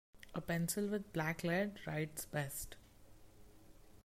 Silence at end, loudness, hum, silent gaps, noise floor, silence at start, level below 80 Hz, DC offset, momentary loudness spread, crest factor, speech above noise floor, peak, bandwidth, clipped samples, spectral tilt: 0.05 s; -40 LUFS; none; none; -60 dBFS; 0.15 s; -64 dBFS; under 0.1%; 10 LU; 16 dB; 20 dB; -26 dBFS; 16 kHz; under 0.1%; -5 dB/octave